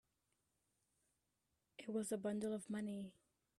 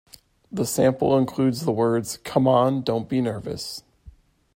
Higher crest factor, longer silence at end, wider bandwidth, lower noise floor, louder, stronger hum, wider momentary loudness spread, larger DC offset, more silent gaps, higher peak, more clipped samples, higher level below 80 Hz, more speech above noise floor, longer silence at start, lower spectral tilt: about the same, 16 dB vs 18 dB; about the same, 0.45 s vs 0.45 s; second, 13.5 kHz vs 16.5 kHz; first, -87 dBFS vs -50 dBFS; second, -45 LUFS vs -23 LUFS; neither; about the same, 13 LU vs 12 LU; neither; neither; second, -32 dBFS vs -4 dBFS; neither; second, -84 dBFS vs -56 dBFS; first, 43 dB vs 28 dB; first, 1.8 s vs 0.5 s; about the same, -5.5 dB/octave vs -6 dB/octave